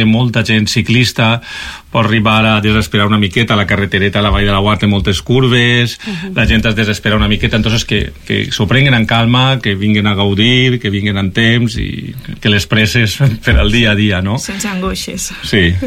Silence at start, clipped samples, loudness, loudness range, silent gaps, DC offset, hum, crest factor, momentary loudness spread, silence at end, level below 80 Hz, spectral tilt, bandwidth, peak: 0 s; under 0.1%; -12 LUFS; 1 LU; none; under 0.1%; none; 12 dB; 8 LU; 0 s; -26 dBFS; -5 dB/octave; 15.5 kHz; 0 dBFS